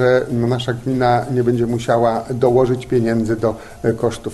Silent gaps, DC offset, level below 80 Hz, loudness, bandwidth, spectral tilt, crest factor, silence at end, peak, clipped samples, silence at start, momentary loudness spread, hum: none; under 0.1%; -42 dBFS; -18 LUFS; 12.5 kHz; -7 dB/octave; 14 dB; 0 s; -2 dBFS; under 0.1%; 0 s; 5 LU; none